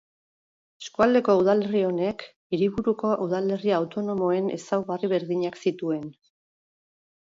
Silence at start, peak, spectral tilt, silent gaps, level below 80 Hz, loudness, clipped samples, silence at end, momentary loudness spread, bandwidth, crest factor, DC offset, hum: 0.8 s; -8 dBFS; -7 dB/octave; 2.36-2.50 s; -62 dBFS; -25 LUFS; under 0.1%; 1.15 s; 10 LU; 7.8 kHz; 18 dB; under 0.1%; none